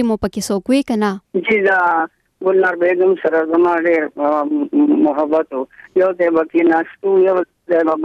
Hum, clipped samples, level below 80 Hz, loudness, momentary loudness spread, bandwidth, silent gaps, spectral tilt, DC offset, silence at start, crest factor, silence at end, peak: none; under 0.1%; -50 dBFS; -16 LUFS; 6 LU; 13.5 kHz; none; -5.5 dB/octave; under 0.1%; 0 s; 12 dB; 0 s; -4 dBFS